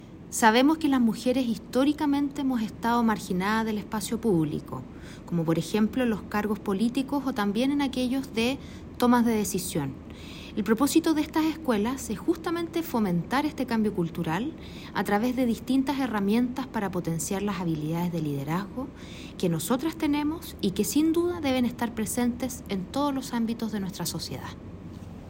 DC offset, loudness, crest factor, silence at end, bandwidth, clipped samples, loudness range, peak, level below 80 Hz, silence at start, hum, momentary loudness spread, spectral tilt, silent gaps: under 0.1%; -27 LUFS; 20 dB; 0 s; 16.5 kHz; under 0.1%; 3 LU; -6 dBFS; -50 dBFS; 0 s; none; 12 LU; -5 dB/octave; none